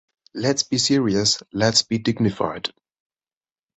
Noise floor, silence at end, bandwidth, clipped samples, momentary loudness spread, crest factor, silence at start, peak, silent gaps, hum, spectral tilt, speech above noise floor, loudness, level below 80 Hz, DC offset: under -90 dBFS; 1.1 s; 8.4 kHz; under 0.1%; 9 LU; 20 dB; 0.35 s; -2 dBFS; none; none; -3.5 dB/octave; over 69 dB; -20 LUFS; -54 dBFS; under 0.1%